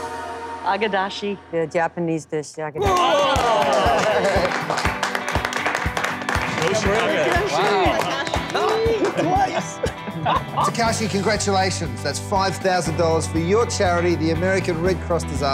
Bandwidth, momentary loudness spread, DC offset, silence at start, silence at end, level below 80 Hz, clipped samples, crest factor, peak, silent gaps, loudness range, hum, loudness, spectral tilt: 16.5 kHz; 8 LU; under 0.1%; 0 s; 0 s; -38 dBFS; under 0.1%; 16 dB; -6 dBFS; none; 2 LU; none; -21 LUFS; -4.5 dB/octave